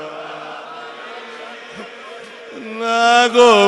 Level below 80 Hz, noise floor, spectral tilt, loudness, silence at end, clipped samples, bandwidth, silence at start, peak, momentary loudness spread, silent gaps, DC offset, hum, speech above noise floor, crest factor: -68 dBFS; -35 dBFS; -2.5 dB/octave; -13 LUFS; 0 s; under 0.1%; 11.5 kHz; 0 s; 0 dBFS; 23 LU; none; under 0.1%; none; 23 dB; 18 dB